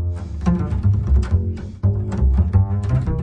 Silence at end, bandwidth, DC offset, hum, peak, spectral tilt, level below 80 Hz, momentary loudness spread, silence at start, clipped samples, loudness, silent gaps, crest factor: 0 s; 7.8 kHz; under 0.1%; none; -4 dBFS; -9.5 dB/octave; -22 dBFS; 5 LU; 0 s; under 0.1%; -20 LUFS; none; 14 dB